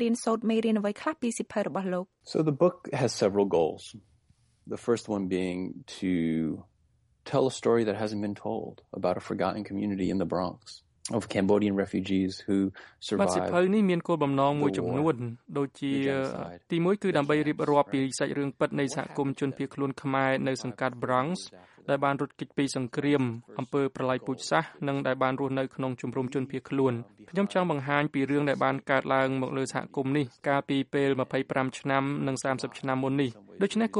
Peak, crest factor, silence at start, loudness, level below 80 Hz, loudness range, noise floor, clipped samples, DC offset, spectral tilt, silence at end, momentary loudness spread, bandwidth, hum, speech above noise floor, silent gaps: -8 dBFS; 20 dB; 0 s; -29 LUFS; -66 dBFS; 3 LU; -68 dBFS; under 0.1%; under 0.1%; -6 dB/octave; 0 s; 8 LU; 11.5 kHz; none; 40 dB; none